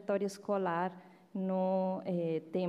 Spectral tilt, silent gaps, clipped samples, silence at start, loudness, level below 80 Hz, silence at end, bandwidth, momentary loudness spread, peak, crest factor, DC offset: -7.5 dB/octave; none; under 0.1%; 0 s; -35 LUFS; -84 dBFS; 0 s; 13 kHz; 7 LU; -22 dBFS; 14 dB; under 0.1%